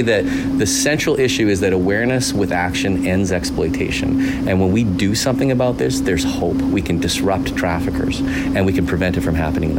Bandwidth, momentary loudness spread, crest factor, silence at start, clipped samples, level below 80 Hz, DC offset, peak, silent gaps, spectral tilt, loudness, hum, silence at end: 16.5 kHz; 4 LU; 12 dB; 0 s; under 0.1%; -32 dBFS; under 0.1%; -6 dBFS; none; -5 dB/octave; -17 LUFS; none; 0 s